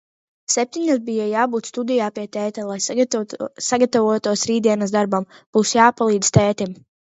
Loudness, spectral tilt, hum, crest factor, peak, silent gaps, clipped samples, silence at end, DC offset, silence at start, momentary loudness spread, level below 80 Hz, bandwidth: -19 LUFS; -4.5 dB/octave; none; 20 dB; 0 dBFS; 5.46-5.53 s; under 0.1%; 0.45 s; under 0.1%; 0.5 s; 10 LU; -52 dBFS; 8.2 kHz